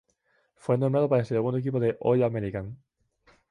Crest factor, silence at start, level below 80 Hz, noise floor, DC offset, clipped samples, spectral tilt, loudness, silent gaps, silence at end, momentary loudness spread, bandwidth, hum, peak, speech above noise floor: 16 dB; 0.65 s; -58 dBFS; -70 dBFS; under 0.1%; under 0.1%; -9.5 dB/octave; -26 LUFS; none; 0.75 s; 12 LU; 10 kHz; none; -10 dBFS; 45 dB